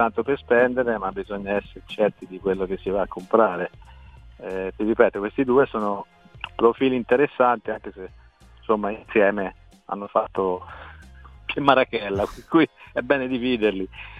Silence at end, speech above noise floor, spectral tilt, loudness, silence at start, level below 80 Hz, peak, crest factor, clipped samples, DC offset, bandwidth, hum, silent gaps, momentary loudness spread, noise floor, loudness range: 0 s; 23 dB; -7 dB/octave; -23 LUFS; 0 s; -50 dBFS; 0 dBFS; 24 dB; under 0.1%; under 0.1%; 8.8 kHz; none; none; 15 LU; -45 dBFS; 4 LU